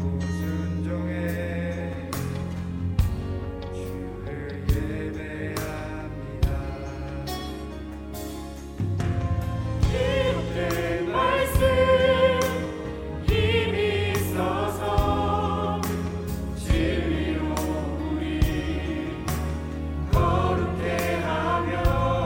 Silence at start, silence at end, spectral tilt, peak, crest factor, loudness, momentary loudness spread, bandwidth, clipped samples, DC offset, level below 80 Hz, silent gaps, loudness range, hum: 0 s; 0 s; -6 dB/octave; -8 dBFS; 18 dB; -26 LUFS; 12 LU; 17 kHz; under 0.1%; under 0.1%; -34 dBFS; none; 8 LU; none